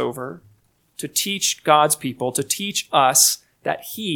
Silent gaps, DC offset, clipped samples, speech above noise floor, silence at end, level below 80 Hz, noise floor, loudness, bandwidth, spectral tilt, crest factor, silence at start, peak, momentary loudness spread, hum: none; under 0.1%; under 0.1%; 39 dB; 0 s; -68 dBFS; -59 dBFS; -19 LUFS; 19 kHz; -1.5 dB/octave; 22 dB; 0 s; 0 dBFS; 13 LU; none